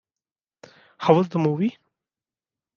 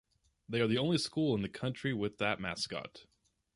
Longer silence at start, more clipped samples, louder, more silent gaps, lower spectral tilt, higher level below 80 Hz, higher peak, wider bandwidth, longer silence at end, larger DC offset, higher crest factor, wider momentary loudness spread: first, 1 s vs 0.5 s; neither; first, -22 LUFS vs -34 LUFS; neither; first, -8.5 dB/octave vs -5.5 dB/octave; second, -70 dBFS vs -64 dBFS; first, -2 dBFS vs -18 dBFS; second, 7 kHz vs 11.5 kHz; first, 1.05 s vs 0.55 s; neither; first, 24 dB vs 18 dB; about the same, 8 LU vs 8 LU